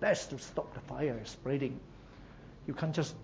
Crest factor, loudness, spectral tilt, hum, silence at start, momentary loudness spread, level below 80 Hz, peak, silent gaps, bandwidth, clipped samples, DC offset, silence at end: 20 dB; -37 LUFS; -5.5 dB/octave; none; 0 s; 19 LU; -58 dBFS; -16 dBFS; none; 8 kHz; under 0.1%; under 0.1%; 0 s